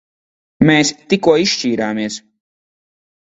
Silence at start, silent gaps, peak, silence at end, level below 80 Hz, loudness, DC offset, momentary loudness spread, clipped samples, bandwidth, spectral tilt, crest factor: 0.6 s; none; 0 dBFS; 1.05 s; -52 dBFS; -15 LUFS; under 0.1%; 11 LU; under 0.1%; 8 kHz; -4.5 dB/octave; 18 dB